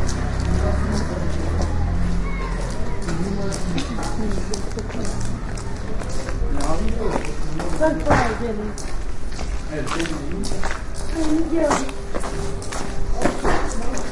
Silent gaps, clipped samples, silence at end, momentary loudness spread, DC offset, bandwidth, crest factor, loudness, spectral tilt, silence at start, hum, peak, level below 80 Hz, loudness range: none; under 0.1%; 0 s; 8 LU; under 0.1%; 11.5 kHz; 16 dB; -25 LUFS; -5.5 dB/octave; 0 s; none; -4 dBFS; -26 dBFS; 3 LU